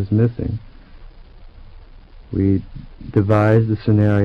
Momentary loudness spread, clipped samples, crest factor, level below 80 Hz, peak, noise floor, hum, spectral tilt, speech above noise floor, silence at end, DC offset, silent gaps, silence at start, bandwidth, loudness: 15 LU; under 0.1%; 14 dB; -38 dBFS; -6 dBFS; -41 dBFS; none; -10.5 dB/octave; 24 dB; 0 s; under 0.1%; none; 0 s; 5.2 kHz; -18 LUFS